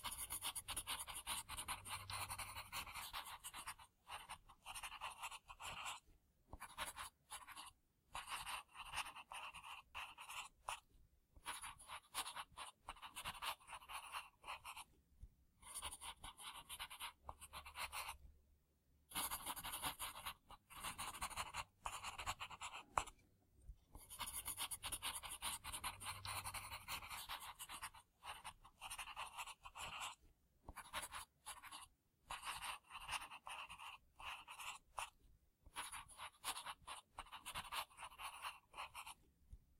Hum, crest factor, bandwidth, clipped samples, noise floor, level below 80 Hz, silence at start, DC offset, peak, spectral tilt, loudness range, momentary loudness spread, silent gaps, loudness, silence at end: none; 32 dB; 16 kHz; under 0.1%; -78 dBFS; -68 dBFS; 0 s; under 0.1%; -20 dBFS; -0.5 dB/octave; 5 LU; 11 LU; none; -50 LUFS; 0 s